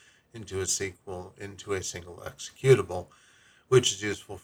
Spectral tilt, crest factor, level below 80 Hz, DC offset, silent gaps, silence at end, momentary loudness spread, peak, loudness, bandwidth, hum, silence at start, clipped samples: -4 dB/octave; 24 dB; -60 dBFS; under 0.1%; none; 0.05 s; 19 LU; -6 dBFS; -27 LUFS; 17 kHz; none; 0.35 s; under 0.1%